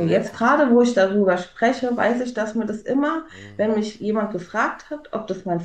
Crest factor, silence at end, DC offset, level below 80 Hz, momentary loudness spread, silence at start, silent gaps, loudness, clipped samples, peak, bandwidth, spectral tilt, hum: 16 dB; 0 s; under 0.1%; -58 dBFS; 13 LU; 0 s; none; -21 LUFS; under 0.1%; -6 dBFS; 9 kHz; -6 dB/octave; none